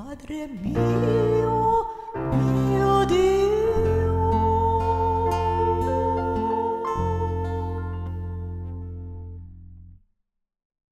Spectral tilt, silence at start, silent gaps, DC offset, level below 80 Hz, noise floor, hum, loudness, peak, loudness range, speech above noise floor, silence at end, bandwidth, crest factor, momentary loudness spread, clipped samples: -8 dB/octave; 0 s; none; under 0.1%; -38 dBFS; -73 dBFS; none; -23 LUFS; -10 dBFS; 10 LU; 50 dB; 1 s; 13 kHz; 14 dB; 14 LU; under 0.1%